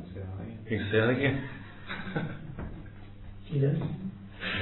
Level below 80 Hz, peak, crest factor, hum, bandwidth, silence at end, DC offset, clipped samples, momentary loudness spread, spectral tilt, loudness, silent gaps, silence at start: -50 dBFS; -14 dBFS; 18 dB; none; 4.2 kHz; 0 s; under 0.1%; under 0.1%; 20 LU; -10.5 dB/octave; -32 LUFS; none; 0 s